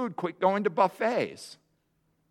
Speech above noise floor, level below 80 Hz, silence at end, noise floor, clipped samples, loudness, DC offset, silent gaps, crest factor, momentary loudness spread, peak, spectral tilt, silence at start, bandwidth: 45 dB; -80 dBFS; 0.8 s; -73 dBFS; under 0.1%; -28 LUFS; under 0.1%; none; 20 dB; 16 LU; -10 dBFS; -6 dB/octave; 0 s; 16 kHz